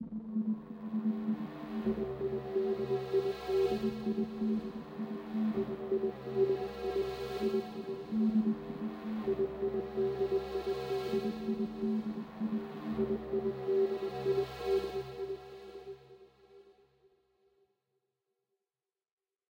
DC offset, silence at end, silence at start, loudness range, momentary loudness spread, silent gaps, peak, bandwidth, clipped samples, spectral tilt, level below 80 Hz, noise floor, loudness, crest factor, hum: under 0.1%; 2.8 s; 0 s; 4 LU; 9 LU; none; -20 dBFS; 16 kHz; under 0.1%; -7.5 dB/octave; -60 dBFS; under -90 dBFS; -35 LUFS; 16 dB; none